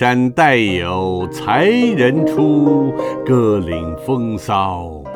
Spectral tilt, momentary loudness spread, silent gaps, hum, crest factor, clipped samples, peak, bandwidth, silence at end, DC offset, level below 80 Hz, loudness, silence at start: -6.5 dB/octave; 9 LU; none; none; 14 dB; under 0.1%; 0 dBFS; 15 kHz; 0 s; under 0.1%; -42 dBFS; -15 LUFS; 0 s